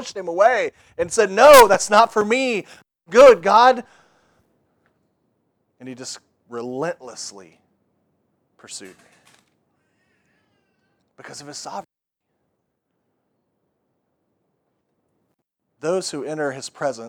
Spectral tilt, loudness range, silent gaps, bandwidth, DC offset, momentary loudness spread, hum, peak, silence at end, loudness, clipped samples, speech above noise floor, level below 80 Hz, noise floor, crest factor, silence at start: -3 dB/octave; 26 LU; none; over 20 kHz; under 0.1%; 26 LU; none; 0 dBFS; 0 s; -16 LUFS; under 0.1%; 62 dB; -56 dBFS; -79 dBFS; 20 dB; 0 s